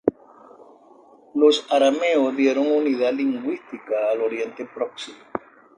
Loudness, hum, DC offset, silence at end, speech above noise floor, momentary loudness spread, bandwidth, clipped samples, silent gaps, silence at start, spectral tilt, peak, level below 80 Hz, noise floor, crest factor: -22 LUFS; none; under 0.1%; 0.4 s; 30 dB; 14 LU; 10 kHz; under 0.1%; none; 0.05 s; -4 dB/octave; -2 dBFS; -68 dBFS; -51 dBFS; 20 dB